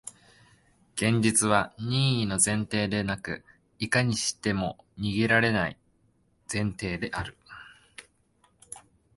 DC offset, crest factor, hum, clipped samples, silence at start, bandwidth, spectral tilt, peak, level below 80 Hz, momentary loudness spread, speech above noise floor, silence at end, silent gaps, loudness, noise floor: under 0.1%; 22 dB; none; under 0.1%; 0.05 s; 12 kHz; -4 dB/octave; -6 dBFS; -54 dBFS; 22 LU; 40 dB; 0.4 s; none; -27 LUFS; -67 dBFS